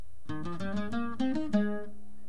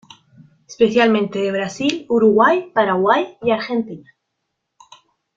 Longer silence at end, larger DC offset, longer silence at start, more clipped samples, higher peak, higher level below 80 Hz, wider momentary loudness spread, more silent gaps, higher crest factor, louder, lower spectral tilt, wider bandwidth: second, 0.15 s vs 1.35 s; first, 2% vs under 0.1%; second, 0 s vs 0.7 s; neither; second, -16 dBFS vs 0 dBFS; about the same, -58 dBFS vs -60 dBFS; about the same, 11 LU vs 9 LU; neither; about the same, 18 dB vs 18 dB; second, -34 LUFS vs -17 LUFS; first, -7.5 dB/octave vs -5.5 dB/octave; first, 10.5 kHz vs 7.8 kHz